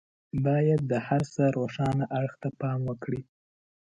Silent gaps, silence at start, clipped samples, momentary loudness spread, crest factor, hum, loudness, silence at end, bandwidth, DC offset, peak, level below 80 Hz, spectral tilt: none; 0.35 s; under 0.1%; 10 LU; 16 dB; none; -28 LUFS; 0.6 s; 8.8 kHz; under 0.1%; -12 dBFS; -58 dBFS; -8.5 dB/octave